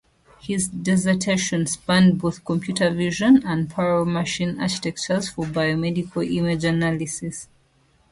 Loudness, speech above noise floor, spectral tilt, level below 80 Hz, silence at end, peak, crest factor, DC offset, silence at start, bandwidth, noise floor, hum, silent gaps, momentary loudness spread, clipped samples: -22 LUFS; 39 dB; -5 dB/octave; -52 dBFS; 0.65 s; -6 dBFS; 16 dB; under 0.1%; 0.45 s; 11.5 kHz; -60 dBFS; none; none; 9 LU; under 0.1%